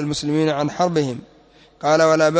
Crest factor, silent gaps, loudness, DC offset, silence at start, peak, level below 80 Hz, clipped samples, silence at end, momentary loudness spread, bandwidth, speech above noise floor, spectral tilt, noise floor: 14 dB; none; -19 LUFS; under 0.1%; 0 s; -4 dBFS; -56 dBFS; under 0.1%; 0 s; 11 LU; 8 kHz; 32 dB; -5.5 dB/octave; -50 dBFS